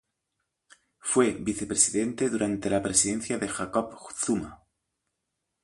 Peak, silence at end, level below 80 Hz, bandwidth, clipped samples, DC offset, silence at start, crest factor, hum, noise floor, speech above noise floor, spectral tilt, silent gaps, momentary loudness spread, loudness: -6 dBFS; 1.1 s; -58 dBFS; 11.5 kHz; under 0.1%; under 0.1%; 1.05 s; 22 dB; none; -82 dBFS; 55 dB; -3.5 dB/octave; none; 9 LU; -26 LUFS